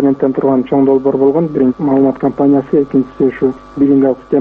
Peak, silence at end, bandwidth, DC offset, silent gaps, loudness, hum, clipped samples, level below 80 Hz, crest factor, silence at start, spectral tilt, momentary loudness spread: 0 dBFS; 0 s; 3.8 kHz; under 0.1%; none; -12 LUFS; none; under 0.1%; -46 dBFS; 10 dB; 0 s; -11 dB/octave; 5 LU